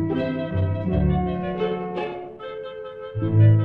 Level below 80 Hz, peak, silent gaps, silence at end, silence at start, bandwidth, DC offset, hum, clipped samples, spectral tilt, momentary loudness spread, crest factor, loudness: -38 dBFS; -6 dBFS; none; 0 s; 0 s; 4.2 kHz; under 0.1%; none; under 0.1%; -11 dB/octave; 14 LU; 16 dB; -24 LUFS